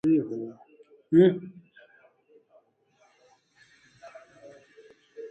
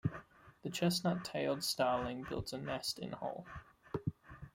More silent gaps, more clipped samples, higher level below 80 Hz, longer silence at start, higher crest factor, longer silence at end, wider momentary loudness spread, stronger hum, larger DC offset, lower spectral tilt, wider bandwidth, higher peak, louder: neither; neither; second, -74 dBFS vs -62 dBFS; about the same, 0.05 s vs 0.05 s; about the same, 22 dB vs 18 dB; about the same, 0.05 s vs 0.05 s; first, 29 LU vs 15 LU; neither; neither; first, -9 dB/octave vs -4.5 dB/octave; second, 6.2 kHz vs 16.5 kHz; first, -8 dBFS vs -22 dBFS; first, -24 LUFS vs -38 LUFS